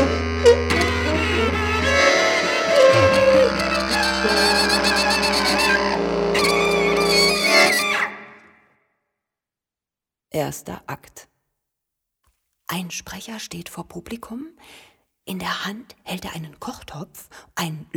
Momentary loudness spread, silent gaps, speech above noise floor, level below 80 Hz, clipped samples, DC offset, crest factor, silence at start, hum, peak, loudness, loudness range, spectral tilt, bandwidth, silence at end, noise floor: 20 LU; none; 57 dB; -40 dBFS; under 0.1%; under 0.1%; 18 dB; 0 s; none; -2 dBFS; -18 LUFS; 18 LU; -3.5 dB/octave; 19.5 kHz; 0 s; -89 dBFS